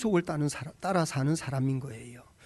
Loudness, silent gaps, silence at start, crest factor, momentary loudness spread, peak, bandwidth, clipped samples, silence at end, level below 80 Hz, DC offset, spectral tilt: -30 LUFS; none; 0 s; 16 dB; 14 LU; -14 dBFS; 12 kHz; under 0.1%; 0 s; -60 dBFS; under 0.1%; -6 dB/octave